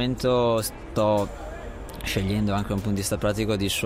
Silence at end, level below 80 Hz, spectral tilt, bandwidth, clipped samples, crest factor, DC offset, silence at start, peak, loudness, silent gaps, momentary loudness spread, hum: 0 s; -40 dBFS; -5 dB/octave; 16 kHz; under 0.1%; 14 dB; under 0.1%; 0 s; -10 dBFS; -25 LUFS; none; 13 LU; none